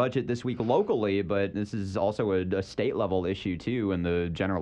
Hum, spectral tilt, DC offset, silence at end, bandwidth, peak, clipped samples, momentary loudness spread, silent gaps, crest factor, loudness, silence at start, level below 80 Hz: none; -7.5 dB/octave; under 0.1%; 0 s; 9.6 kHz; -12 dBFS; under 0.1%; 5 LU; none; 16 dB; -29 LUFS; 0 s; -54 dBFS